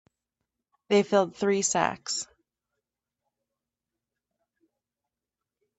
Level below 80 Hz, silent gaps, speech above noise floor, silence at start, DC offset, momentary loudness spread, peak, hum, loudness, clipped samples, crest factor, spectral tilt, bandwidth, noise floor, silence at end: -72 dBFS; none; 64 dB; 0.9 s; under 0.1%; 9 LU; -8 dBFS; none; -26 LUFS; under 0.1%; 24 dB; -3.5 dB/octave; 8.4 kHz; -89 dBFS; 3.55 s